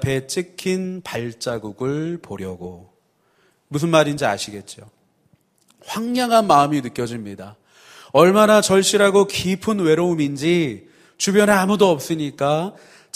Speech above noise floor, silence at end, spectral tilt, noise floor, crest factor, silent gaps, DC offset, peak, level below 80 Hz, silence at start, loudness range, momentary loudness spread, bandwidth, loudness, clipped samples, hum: 44 dB; 0.45 s; -4.5 dB/octave; -62 dBFS; 20 dB; none; under 0.1%; 0 dBFS; -56 dBFS; 0 s; 8 LU; 17 LU; 15.5 kHz; -18 LUFS; under 0.1%; none